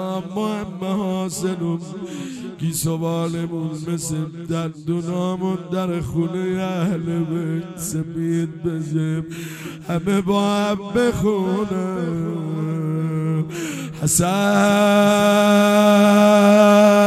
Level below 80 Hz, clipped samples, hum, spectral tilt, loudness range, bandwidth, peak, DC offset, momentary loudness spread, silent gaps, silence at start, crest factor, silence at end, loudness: -50 dBFS; under 0.1%; none; -5.5 dB/octave; 9 LU; 15 kHz; 0 dBFS; under 0.1%; 13 LU; none; 0 s; 18 dB; 0 s; -19 LUFS